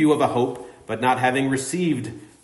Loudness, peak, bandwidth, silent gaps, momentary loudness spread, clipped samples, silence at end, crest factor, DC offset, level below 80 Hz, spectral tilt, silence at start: -22 LUFS; -6 dBFS; 11.5 kHz; none; 13 LU; under 0.1%; 0.15 s; 16 dB; under 0.1%; -60 dBFS; -5.5 dB/octave; 0 s